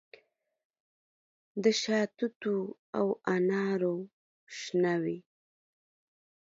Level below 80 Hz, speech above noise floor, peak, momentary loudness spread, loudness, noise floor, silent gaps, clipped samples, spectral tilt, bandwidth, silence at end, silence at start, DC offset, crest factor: -80 dBFS; 40 dB; -14 dBFS; 13 LU; -31 LUFS; -70 dBFS; 2.36-2.41 s, 2.79-2.93 s, 4.13-4.47 s; under 0.1%; -5 dB/octave; 7.8 kHz; 1.3 s; 1.55 s; under 0.1%; 20 dB